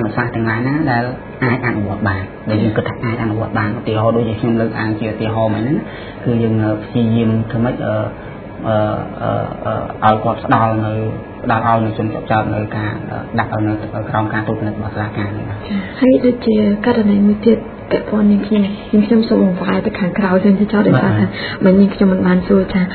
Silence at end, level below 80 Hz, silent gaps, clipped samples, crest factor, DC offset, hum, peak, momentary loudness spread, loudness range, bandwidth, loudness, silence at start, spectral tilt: 0 s; -40 dBFS; none; under 0.1%; 16 dB; under 0.1%; none; 0 dBFS; 9 LU; 5 LU; 4.5 kHz; -16 LUFS; 0 s; -11.5 dB/octave